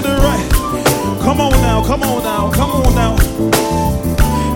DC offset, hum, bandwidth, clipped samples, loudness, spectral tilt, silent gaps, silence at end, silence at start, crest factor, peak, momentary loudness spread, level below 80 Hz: under 0.1%; none; 17 kHz; under 0.1%; -14 LUFS; -5.5 dB/octave; none; 0 s; 0 s; 12 dB; 0 dBFS; 3 LU; -18 dBFS